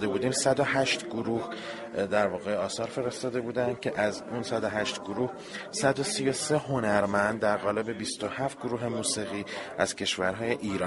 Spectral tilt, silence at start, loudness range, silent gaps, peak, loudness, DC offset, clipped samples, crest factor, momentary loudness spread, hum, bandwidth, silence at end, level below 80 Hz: -4 dB/octave; 0 s; 3 LU; none; -8 dBFS; -29 LUFS; under 0.1%; under 0.1%; 20 dB; 7 LU; none; 11.5 kHz; 0 s; -62 dBFS